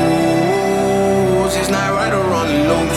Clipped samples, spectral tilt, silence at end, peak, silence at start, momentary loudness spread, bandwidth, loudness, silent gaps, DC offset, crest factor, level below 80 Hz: under 0.1%; -5.5 dB/octave; 0 s; -4 dBFS; 0 s; 2 LU; 16 kHz; -15 LUFS; none; under 0.1%; 12 dB; -36 dBFS